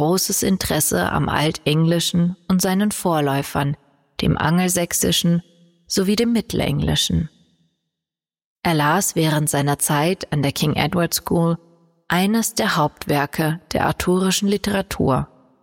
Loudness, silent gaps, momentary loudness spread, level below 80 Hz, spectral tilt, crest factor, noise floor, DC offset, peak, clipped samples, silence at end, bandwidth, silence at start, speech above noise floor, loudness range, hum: -19 LUFS; 8.45-8.56 s; 5 LU; -42 dBFS; -4.5 dB/octave; 16 dB; -88 dBFS; under 0.1%; -4 dBFS; under 0.1%; 0.4 s; 17 kHz; 0 s; 69 dB; 2 LU; none